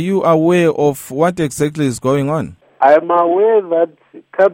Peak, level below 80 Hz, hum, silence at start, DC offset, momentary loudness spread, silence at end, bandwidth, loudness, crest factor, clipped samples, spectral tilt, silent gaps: 0 dBFS; -52 dBFS; none; 0 s; under 0.1%; 8 LU; 0 s; 16.5 kHz; -14 LUFS; 14 dB; under 0.1%; -6.5 dB/octave; none